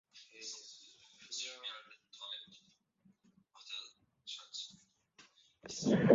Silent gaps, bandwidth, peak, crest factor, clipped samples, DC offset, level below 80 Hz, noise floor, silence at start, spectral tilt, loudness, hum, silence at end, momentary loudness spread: none; 7.6 kHz; -12 dBFS; 28 dB; under 0.1%; under 0.1%; -74 dBFS; -72 dBFS; 0.15 s; -5 dB/octave; -43 LUFS; none; 0 s; 22 LU